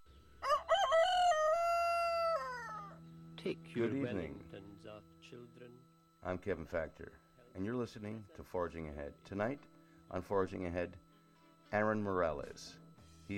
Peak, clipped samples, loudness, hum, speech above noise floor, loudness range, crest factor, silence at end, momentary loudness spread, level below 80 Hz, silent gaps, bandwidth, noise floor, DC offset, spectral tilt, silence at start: -20 dBFS; under 0.1%; -37 LUFS; none; 25 dB; 11 LU; 18 dB; 0 s; 23 LU; -62 dBFS; none; 16 kHz; -66 dBFS; under 0.1%; -5 dB/octave; 0 s